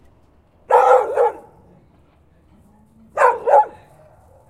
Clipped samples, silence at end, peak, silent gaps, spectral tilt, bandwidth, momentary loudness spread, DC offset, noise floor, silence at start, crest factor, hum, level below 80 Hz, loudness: under 0.1%; 0.8 s; 0 dBFS; none; -4 dB/octave; 12.5 kHz; 9 LU; under 0.1%; -54 dBFS; 0.7 s; 18 dB; none; -60 dBFS; -16 LUFS